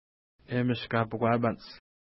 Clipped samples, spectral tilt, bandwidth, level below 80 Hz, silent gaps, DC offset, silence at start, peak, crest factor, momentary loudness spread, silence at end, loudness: under 0.1%; -10.5 dB/octave; 5.8 kHz; -64 dBFS; none; under 0.1%; 0.5 s; -12 dBFS; 18 dB; 12 LU; 0.4 s; -29 LUFS